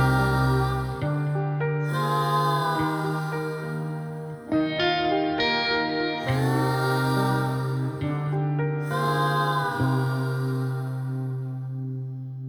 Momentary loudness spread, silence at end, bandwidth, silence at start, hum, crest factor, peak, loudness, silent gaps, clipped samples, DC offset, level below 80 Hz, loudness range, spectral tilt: 8 LU; 0 s; 19 kHz; 0 s; none; 16 dB; -10 dBFS; -25 LUFS; none; under 0.1%; under 0.1%; -46 dBFS; 2 LU; -6.5 dB/octave